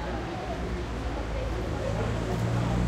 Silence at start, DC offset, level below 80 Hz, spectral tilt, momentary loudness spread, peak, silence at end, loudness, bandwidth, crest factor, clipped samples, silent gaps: 0 s; under 0.1%; -36 dBFS; -6.5 dB/octave; 5 LU; -16 dBFS; 0 s; -31 LUFS; 12.5 kHz; 12 dB; under 0.1%; none